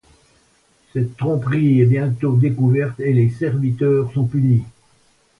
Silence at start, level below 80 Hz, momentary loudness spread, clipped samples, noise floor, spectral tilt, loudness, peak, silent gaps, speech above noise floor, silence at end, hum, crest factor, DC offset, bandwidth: 0.95 s; -52 dBFS; 7 LU; under 0.1%; -58 dBFS; -10 dB/octave; -18 LUFS; -4 dBFS; none; 41 dB; 0.7 s; none; 14 dB; under 0.1%; 3.9 kHz